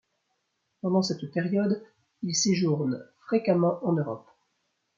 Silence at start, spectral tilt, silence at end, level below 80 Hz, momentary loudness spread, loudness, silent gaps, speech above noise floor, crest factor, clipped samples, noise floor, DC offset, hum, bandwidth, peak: 0.85 s; -5 dB/octave; 0.75 s; -74 dBFS; 11 LU; -27 LUFS; none; 51 dB; 18 dB; under 0.1%; -77 dBFS; under 0.1%; none; 7.6 kHz; -10 dBFS